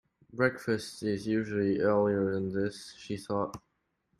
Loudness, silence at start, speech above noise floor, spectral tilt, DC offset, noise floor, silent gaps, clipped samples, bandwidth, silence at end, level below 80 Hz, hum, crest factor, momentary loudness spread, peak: -31 LUFS; 0.35 s; 47 dB; -6.5 dB/octave; under 0.1%; -77 dBFS; none; under 0.1%; 13.5 kHz; 0.6 s; -64 dBFS; none; 20 dB; 13 LU; -12 dBFS